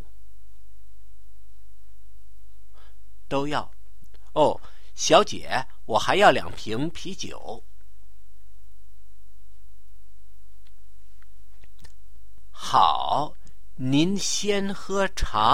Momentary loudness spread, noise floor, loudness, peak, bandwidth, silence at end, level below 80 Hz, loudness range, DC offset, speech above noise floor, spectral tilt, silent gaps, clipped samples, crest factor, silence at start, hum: 17 LU; -53 dBFS; -24 LUFS; -2 dBFS; 16.5 kHz; 0 s; -44 dBFS; 14 LU; 5%; 30 dB; -3.5 dB/octave; none; under 0.1%; 26 dB; 3.3 s; none